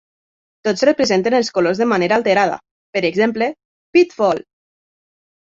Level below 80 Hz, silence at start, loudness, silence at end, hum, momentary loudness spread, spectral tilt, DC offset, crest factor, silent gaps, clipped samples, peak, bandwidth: -60 dBFS; 0.65 s; -17 LUFS; 1 s; none; 8 LU; -5 dB/octave; under 0.1%; 16 dB; 2.71-2.93 s, 3.65-3.93 s; under 0.1%; -2 dBFS; 7.8 kHz